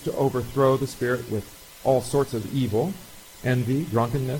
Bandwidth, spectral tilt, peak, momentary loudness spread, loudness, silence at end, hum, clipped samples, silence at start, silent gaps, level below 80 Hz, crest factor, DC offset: 17 kHz; -6.5 dB/octave; -8 dBFS; 10 LU; -25 LUFS; 0 s; none; under 0.1%; 0 s; none; -50 dBFS; 18 dB; under 0.1%